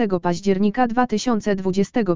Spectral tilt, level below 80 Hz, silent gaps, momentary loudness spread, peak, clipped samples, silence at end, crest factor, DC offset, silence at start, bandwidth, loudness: -6 dB/octave; -48 dBFS; none; 2 LU; -4 dBFS; under 0.1%; 0 s; 16 dB; 2%; 0 s; 7.6 kHz; -21 LUFS